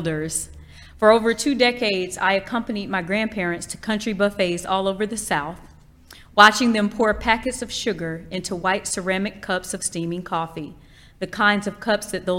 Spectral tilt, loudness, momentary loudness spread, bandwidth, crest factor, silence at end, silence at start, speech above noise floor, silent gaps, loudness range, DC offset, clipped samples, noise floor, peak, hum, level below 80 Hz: -3.5 dB/octave; -21 LUFS; 12 LU; 16.5 kHz; 22 dB; 0 s; 0 s; 25 dB; none; 6 LU; under 0.1%; under 0.1%; -47 dBFS; 0 dBFS; none; -46 dBFS